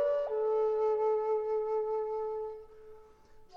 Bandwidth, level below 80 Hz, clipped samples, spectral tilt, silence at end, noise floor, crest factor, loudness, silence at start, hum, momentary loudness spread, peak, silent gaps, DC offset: 5.4 kHz; -64 dBFS; under 0.1%; -5.5 dB/octave; 0 s; -56 dBFS; 10 dB; -32 LUFS; 0 s; none; 9 LU; -22 dBFS; none; under 0.1%